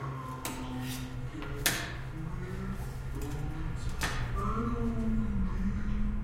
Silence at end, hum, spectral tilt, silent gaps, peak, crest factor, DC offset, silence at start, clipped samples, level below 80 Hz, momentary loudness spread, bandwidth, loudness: 0 s; none; -4.5 dB/octave; none; -8 dBFS; 24 dB; under 0.1%; 0 s; under 0.1%; -38 dBFS; 8 LU; 16 kHz; -35 LUFS